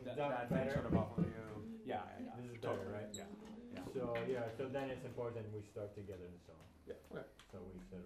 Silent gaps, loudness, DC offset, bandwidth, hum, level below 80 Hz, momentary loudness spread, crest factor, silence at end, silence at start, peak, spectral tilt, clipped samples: none; -44 LUFS; under 0.1%; 14 kHz; none; -64 dBFS; 16 LU; 22 dB; 0 s; 0 s; -22 dBFS; -7 dB/octave; under 0.1%